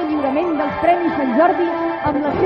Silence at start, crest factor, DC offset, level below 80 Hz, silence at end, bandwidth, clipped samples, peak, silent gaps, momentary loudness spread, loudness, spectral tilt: 0 s; 12 dB; under 0.1%; -48 dBFS; 0 s; 5.8 kHz; under 0.1%; -4 dBFS; none; 5 LU; -18 LUFS; -8.5 dB/octave